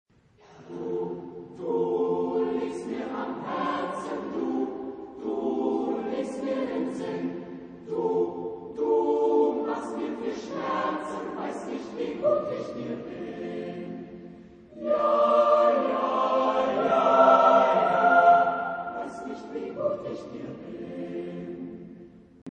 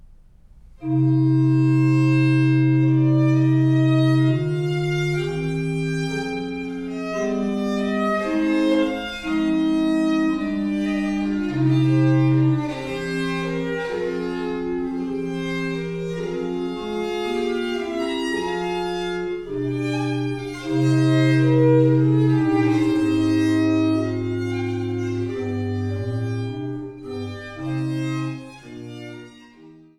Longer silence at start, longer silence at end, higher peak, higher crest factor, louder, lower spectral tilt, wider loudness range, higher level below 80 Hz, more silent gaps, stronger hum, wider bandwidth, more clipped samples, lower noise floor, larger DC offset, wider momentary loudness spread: first, 0.5 s vs 0.1 s; second, 0.05 s vs 0.25 s; about the same, -6 dBFS vs -6 dBFS; first, 20 dB vs 14 dB; second, -26 LUFS vs -21 LUFS; about the same, -6.5 dB/octave vs -7.5 dB/octave; first, 11 LU vs 8 LU; second, -66 dBFS vs -48 dBFS; first, 22.42-22.46 s vs none; neither; second, 9.6 kHz vs 11 kHz; neither; first, -56 dBFS vs -48 dBFS; neither; first, 18 LU vs 10 LU